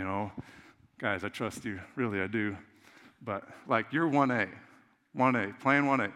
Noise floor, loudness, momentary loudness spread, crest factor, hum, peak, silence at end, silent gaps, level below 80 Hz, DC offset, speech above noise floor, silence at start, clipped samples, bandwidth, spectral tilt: -58 dBFS; -31 LUFS; 13 LU; 22 dB; none; -10 dBFS; 0 s; none; -74 dBFS; under 0.1%; 27 dB; 0 s; under 0.1%; 13.5 kHz; -6.5 dB/octave